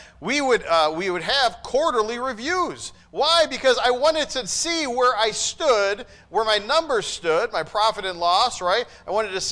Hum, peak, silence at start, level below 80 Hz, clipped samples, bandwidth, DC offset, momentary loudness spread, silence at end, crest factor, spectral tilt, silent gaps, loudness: none; -8 dBFS; 0 s; -52 dBFS; under 0.1%; 10.5 kHz; under 0.1%; 6 LU; 0 s; 14 dB; -1.5 dB/octave; none; -21 LUFS